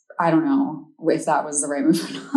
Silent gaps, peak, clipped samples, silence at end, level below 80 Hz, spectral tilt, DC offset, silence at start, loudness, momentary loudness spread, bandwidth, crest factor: none; -6 dBFS; under 0.1%; 0 s; -86 dBFS; -4.5 dB/octave; under 0.1%; 0.2 s; -21 LUFS; 5 LU; 13 kHz; 14 dB